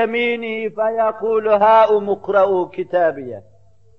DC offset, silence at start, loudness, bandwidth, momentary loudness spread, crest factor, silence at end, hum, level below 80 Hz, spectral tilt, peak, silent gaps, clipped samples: 0.4%; 0 s; -17 LUFS; 6.2 kHz; 11 LU; 14 dB; 0.6 s; none; -62 dBFS; -7 dB/octave; -4 dBFS; none; under 0.1%